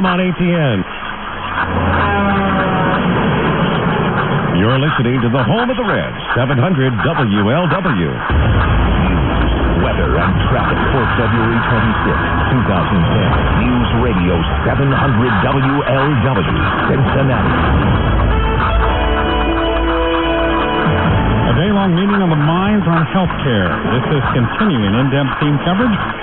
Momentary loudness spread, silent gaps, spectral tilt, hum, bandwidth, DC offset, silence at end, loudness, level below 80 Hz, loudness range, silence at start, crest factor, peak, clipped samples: 2 LU; none; -10.5 dB/octave; none; 4.2 kHz; under 0.1%; 0 s; -14 LUFS; -22 dBFS; 1 LU; 0 s; 12 dB; -2 dBFS; under 0.1%